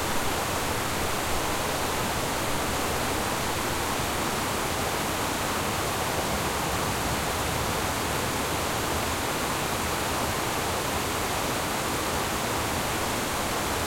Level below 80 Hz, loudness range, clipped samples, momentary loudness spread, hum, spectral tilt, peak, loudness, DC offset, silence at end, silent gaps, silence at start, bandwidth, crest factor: -42 dBFS; 0 LU; under 0.1%; 0 LU; none; -3 dB/octave; -14 dBFS; -27 LUFS; under 0.1%; 0 s; none; 0 s; 16.5 kHz; 14 dB